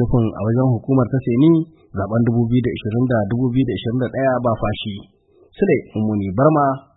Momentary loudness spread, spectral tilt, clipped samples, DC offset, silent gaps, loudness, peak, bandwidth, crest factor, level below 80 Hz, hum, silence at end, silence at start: 7 LU; -13 dB/octave; under 0.1%; under 0.1%; none; -18 LUFS; -2 dBFS; 4 kHz; 16 dB; -42 dBFS; none; 0.15 s; 0 s